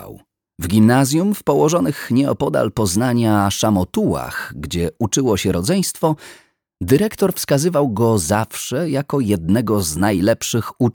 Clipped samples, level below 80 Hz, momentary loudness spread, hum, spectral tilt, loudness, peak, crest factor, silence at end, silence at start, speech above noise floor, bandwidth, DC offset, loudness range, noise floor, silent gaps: under 0.1%; -44 dBFS; 7 LU; none; -5.5 dB/octave; -18 LUFS; -2 dBFS; 16 dB; 0.05 s; 0 s; 24 dB; over 20 kHz; under 0.1%; 3 LU; -41 dBFS; none